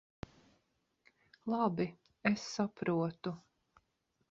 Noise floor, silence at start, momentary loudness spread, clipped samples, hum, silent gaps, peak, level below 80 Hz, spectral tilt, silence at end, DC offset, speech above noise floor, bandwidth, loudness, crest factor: -80 dBFS; 1.45 s; 18 LU; under 0.1%; none; none; -16 dBFS; -70 dBFS; -5.5 dB/octave; 0.95 s; under 0.1%; 45 dB; 7.6 kHz; -37 LUFS; 22 dB